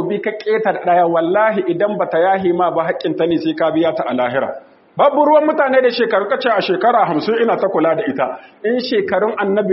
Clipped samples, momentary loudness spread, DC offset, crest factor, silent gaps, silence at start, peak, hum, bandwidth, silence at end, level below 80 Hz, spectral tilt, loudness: under 0.1%; 7 LU; under 0.1%; 14 dB; none; 0 s; 0 dBFS; none; 5.8 kHz; 0 s; -62 dBFS; -3.5 dB/octave; -16 LUFS